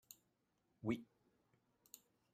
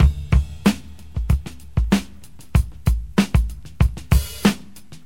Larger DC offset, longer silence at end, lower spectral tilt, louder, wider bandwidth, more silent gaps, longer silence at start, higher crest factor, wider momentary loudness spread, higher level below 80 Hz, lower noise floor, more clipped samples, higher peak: second, under 0.1% vs 1%; first, 1.3 s vs 0.1 s; about the same, -6 dB/octave vs -6 dB/octave; second, -46 LUFS vs -22 LUFS; about the same, 16 kHz vs 16.5 kHz; neither; about the same, 0.1 s vs 0 s; first, 24 dB vs 18 dB; first, 18 LU vs 12 LU; second, -80 dBFS vs -24 dBFS; first, -84 dBFS vs -44 dBFS; neither; second, -28 dBFS vs 0 dBFS